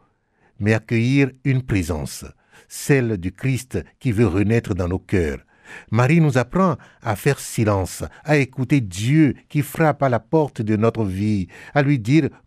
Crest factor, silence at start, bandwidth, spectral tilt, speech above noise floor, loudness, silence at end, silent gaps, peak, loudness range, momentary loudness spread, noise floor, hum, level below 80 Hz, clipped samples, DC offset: 16 dB; 0.6 s; 15.5 kHz; -7 dB/octave; 42 dB; -20 LUFS; 0.2 s; none; -4 dBFS; 2 LU; 10 LU; -61 dBFS; none; -44 dBFS; under 0.1%; under 0.1%